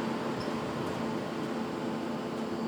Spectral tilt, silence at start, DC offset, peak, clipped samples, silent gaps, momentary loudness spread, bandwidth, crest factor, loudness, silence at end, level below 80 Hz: -6 dB/octave; 0 s; under 0.1%; -20 dBFS; under 0.1%; none; 1 LU; over 20 kHz; 14 dB; -34 LUFS; 0 s; -66 dBFS